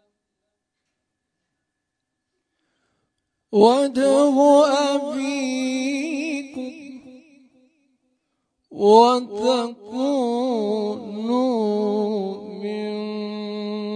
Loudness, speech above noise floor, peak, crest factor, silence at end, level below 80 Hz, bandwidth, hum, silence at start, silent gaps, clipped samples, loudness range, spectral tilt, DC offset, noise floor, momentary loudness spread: -20 LUFS; 62 dB; -2 dBFS; 20 dB; 0 s; -74 dBFS; 10.5 kHz; none; 3.5 s; none; under 0.1%; 9 LU; -5 dB/octave; under 0.1%; -80 dBFS; 15 LU